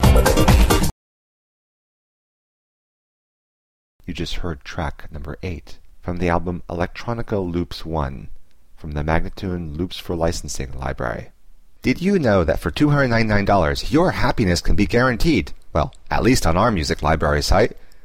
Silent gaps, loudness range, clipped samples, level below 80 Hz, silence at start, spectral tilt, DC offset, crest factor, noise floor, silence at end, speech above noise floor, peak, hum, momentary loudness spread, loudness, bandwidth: 0.92-3.99 s; 13 LU; under 0.1%; -26 dBFS; 0 s; -5.5 dB/octave; 0.7%; 18 dB; -46 dBFS; 0.1 s; 27 dB; -2 dBFS; none; 13 LU; -20 LUFS; 16 kHz